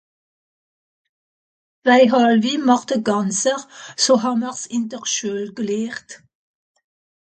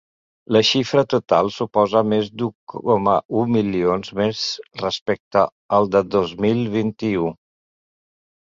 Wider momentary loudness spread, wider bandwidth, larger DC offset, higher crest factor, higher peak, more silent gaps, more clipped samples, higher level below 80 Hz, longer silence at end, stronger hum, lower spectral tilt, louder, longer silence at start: first, 12 LU vs 8 LU; first, 9.2 kHz vs 7.6 kHz; neither; about the same, 20 dB vs 18 dB; about the same, -2 dBFS vs -2 dBFS; second, none vs 2.55-2.67 s, 3.25-3.29 s, 5.02-5.06 s, 5.20-5.31 s, 5.52-5.69 s; neither; second, -70 dBFS vs -54 dBFS; about the same, 1.2 s vs 1.1 s; neither; second, -3.5 dB/octave vs -5.5 dB/octave; about the same, -18 LUFS vs -20 LUFS; first, 1.85 s vs 0.5 s